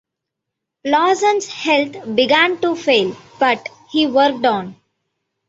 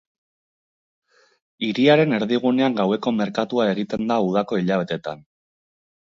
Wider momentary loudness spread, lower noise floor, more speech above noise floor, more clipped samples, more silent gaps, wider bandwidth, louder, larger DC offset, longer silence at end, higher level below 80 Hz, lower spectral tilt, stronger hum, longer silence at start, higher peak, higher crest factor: about the same, 9 LU vs 11 LU; second, -80 dBFS vs under -90 dBFS; second, 64 dB vs over 70 dB; neither; neither; about the same, 8 kHz vs 7.4 kHz; first, -16 LUFS vs -21 LUFS; neither; second, 0.75 s vs 0.95 s; about the same, -62 dBFS vs -64 dBFS; second, -3.5 dB/octave vs -7 dB/octave; neither; second, 0.85 s vs 1.6 s; about the same, -2 dBFS vs -4 dBFS; about the same, 16 dB vs 18 dB